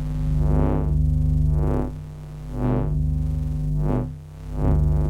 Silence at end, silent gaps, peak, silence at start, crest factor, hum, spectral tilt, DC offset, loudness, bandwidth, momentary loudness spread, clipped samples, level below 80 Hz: 0 s; none; -6 dBFS; 0 s; 14 dB; none; -10 dB/octave; under 0.1%; -23 LUFS; 4.3 kHz; 13 LU; under 0.1%; -26 dBFS